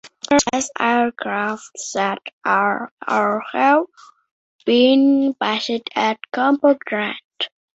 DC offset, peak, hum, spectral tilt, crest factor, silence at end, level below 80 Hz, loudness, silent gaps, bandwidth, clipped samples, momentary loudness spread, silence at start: under 0.1%; -2 dBFS; none; -3 dB/octave; 18 dB; 0.3 s; -60 dBFS; -19 LUFS; 2.33-2.41 s, 2.91-2.97 s, 4.31-4.59 s, 7.24-7.30 s; 8.2 kHz; under 0.1%; 11 LU; 0.05 s